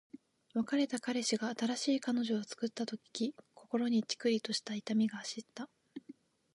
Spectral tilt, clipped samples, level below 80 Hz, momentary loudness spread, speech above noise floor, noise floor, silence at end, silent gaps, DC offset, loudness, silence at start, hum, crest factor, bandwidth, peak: -4 dB/octave; under 0.1%; -86 dBFS; 13 LU; 23 dB; -58 dBFS; 0.4 s; none; under 0.1%; -36 LUFS; 0.55 s; none; 16 dB; 11.5 kHz; -20 dBFS